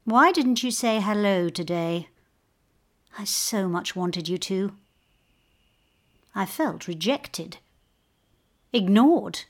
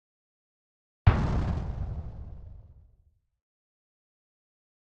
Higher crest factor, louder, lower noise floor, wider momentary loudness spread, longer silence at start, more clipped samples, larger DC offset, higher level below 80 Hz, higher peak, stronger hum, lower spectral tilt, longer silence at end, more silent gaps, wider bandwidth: second, 18 dB vs 28 dB; first, -24 LUFS vs -29 LUFS; about the same, -68 dBFS vs -66 dBFS; second, 14 LU vs 22 LU; second, 0.05 s vs 1.05 s; neither; neither; second, -68 dBFS vs -38 dBFS; about the same, -6 dBFS vs -4 dBFS; neither; second, -4.5 dB/octave vs -8.5 dB/octave; second, 0.05 s vs 2.3 s; neither; first, 18 kHz vs 7.2 kHz